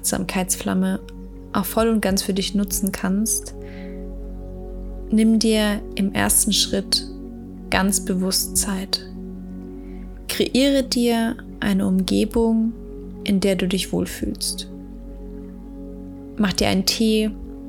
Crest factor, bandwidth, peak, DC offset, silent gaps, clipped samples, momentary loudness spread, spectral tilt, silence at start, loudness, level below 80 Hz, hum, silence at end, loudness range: 22 dB; 18.5 kHz; 0 dBFS; under 0.1%; none; under 0.1%; 18 LU; -4 dB/octave; 0 s; -20 LUFS; -38 dBFS; none; 0 s; 5 LU